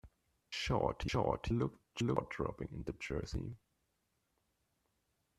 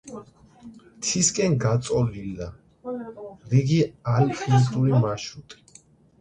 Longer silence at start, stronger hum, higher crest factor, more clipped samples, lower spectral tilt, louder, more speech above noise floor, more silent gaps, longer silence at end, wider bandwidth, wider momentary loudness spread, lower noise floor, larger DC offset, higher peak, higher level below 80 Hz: about the same, 0.05 s vs 0.05 s; neither; first, 24 dB vs 16 dB; neither; about the same, -6 dB/octave vs -5.5 dB/octave; second, -39 LUFS vs -23 LUFS; first, 44 dB vs 32 dB; neither; first, 1.8 s vs 0.65 s; first, 13 kHz vs 9.8 kHz; second, 9 LU vs 19 LU; first, -82 dBFS vs -54 dBFS; neither; second, -16 dBFS vs -8 dBFS; about the same, -52 dBFS vs -52 dBFS